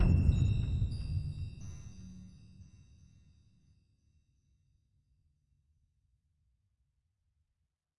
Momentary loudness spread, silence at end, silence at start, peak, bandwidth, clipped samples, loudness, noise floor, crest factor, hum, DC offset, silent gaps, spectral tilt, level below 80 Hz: 23 LU; 5.35 s; 0 s; -14 dBFS; 10 kHz; under 0.1%; -34 LUFS; -84 dBFS; 22 dB; none; under 0.1%; none; -8 dB/octave; -42 dBFS